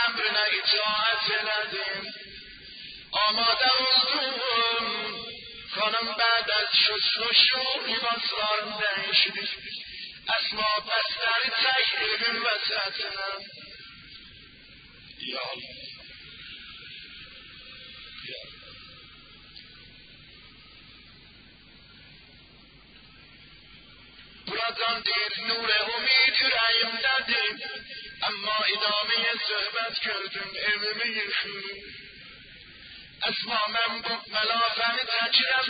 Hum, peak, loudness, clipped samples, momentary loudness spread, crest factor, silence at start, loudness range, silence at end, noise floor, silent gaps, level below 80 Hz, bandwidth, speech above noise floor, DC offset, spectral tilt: none; -6 dBFS; -24 LUFS; under 0.1%; 22 LU; 22 dB; 0 s; 17 LU; 0 s; -53 dBFS; none; -64 dBFS; 5.2 kHz; 26 dB; under 0.1%; -5.5 dB/octave